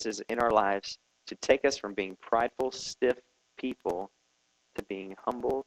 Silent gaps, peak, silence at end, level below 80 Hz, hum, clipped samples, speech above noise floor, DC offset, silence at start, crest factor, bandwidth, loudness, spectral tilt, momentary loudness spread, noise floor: none; -10 dBFS; 0.05 s; -62 dBFS; none; under 0.1%; 42 dB; under 0.1%; 0 s; 22 dB; 14 kHz; -31 LUFS; -3.5 dB/octave; 16 LU; -73 dBFS